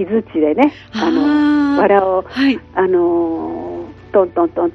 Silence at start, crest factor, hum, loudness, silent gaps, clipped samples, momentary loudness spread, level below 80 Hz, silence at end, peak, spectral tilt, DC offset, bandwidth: 0 s; 14 dB; none; -15 LUFS; none; under 0.1%; 10 LU; -48 dBFS; 0.05 s; 0 dBFS; -7 dB/octave; under 0.1%; 6.4 kHz